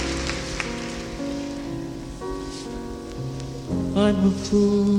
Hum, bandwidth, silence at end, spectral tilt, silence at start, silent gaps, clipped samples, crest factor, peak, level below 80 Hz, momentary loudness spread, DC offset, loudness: none; 11.5 kHz; 0 s; -6 dB/octave; 0 s; none; under 0.1%; 18 dB; -8 dBFS; -40 dBFS; 13 LU; under 0.1%; -26 LUFS